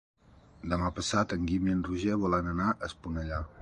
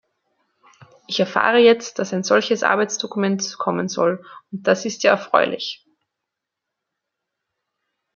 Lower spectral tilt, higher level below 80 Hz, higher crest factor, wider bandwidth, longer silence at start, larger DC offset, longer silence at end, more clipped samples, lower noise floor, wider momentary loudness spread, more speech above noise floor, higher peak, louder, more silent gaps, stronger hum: first, -5.5 dB/octave vs -4 dB/octave; first, -44 dBFS vs -72 dBFS; about the same, 18 dB vs 20 dB; first, 11 kHz vs 7.4 kHz; second, 0.65 s vs 1.1 s; neither; second, 0 s vs 2.4 s; neither; second, -55 dBFS vs -83 dBFS; second, 8 LU vs 12 LU; second, 24 dB vs 64 dB; second, -14 dBFS vs -2 dBFS; second, -31 LUFS vs -19 LUFS; neither; neither